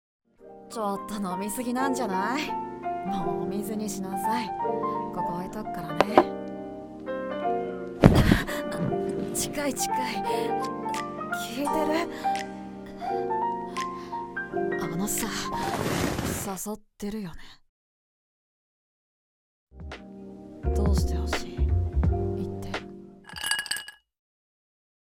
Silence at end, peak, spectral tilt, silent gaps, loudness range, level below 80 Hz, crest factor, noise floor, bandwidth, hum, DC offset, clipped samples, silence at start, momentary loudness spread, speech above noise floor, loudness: 1.25 s; 0 dBFS; -5 dB/octave; 17.69-19.67 s; 8 LU; -38 dBFS; 28 dB; under -90 dBFS; 17.5 kHz; none; under 0.1%; under 0.1%; 0.4 s; 12 LU; over 62 dB; -28 LUFS